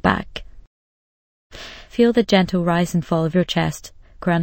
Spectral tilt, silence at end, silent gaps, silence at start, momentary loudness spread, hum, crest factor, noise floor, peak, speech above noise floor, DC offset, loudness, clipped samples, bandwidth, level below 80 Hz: -6 dB/octave; 0 s; 0.67-1.50 s; 0.05 s; 19 LU; none; 20 dB; under -90 dBFS; -2 dBFS; over 72 dB; under 0.1%; -19 LUFS; under 0.1%; 16.5 kHz; -44 dBFS